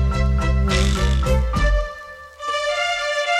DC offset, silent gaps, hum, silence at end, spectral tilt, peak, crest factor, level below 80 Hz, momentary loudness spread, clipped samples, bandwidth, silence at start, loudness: under 0.1%; none; none; 0 s; -5 dB/octave; -6 dBFS; 14 dB; -22 dBFS; 12 LU; under 0.1%; 12 kHz; 0 s; -20 LUFS